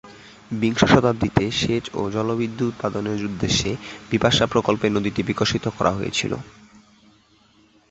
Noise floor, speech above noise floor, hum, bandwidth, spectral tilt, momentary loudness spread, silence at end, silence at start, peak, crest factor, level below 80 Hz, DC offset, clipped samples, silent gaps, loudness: -57 dBFS; 35 dB; none; 8.2 kHz; -5 dB/octave; 9 LU; 1.4 s; 0.05 s; -2 dBFS; 20 dB; -44 dBFS; under 0.1%; under 0.1%; none; -22 LUFS